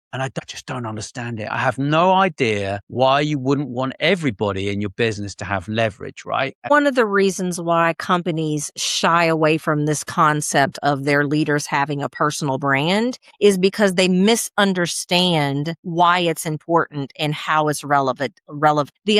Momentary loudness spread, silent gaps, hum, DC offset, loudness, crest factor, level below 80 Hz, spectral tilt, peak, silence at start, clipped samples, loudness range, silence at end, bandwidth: 9 LU; 2.83-2.87 s, 6.55-6.62 s, 15.78-15.83 s; none; under 0.1%; -19 LUFS; 16 dB; -60 dBFS; -4.5 dB/octave; -4 dBFS; 0.15 s; under 0.1%; 3 LU; 0 s; 16 kHz